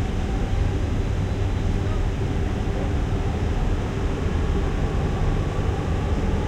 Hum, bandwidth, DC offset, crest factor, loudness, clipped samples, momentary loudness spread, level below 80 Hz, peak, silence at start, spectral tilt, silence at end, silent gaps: none; 9.8 kHz; under 0.1%; 12 dB; -25 LUFS; under 0.1%; 1 LU; -26 dBFS; -10 dBFS; 0 s; -7 dB/octave; 0 s; none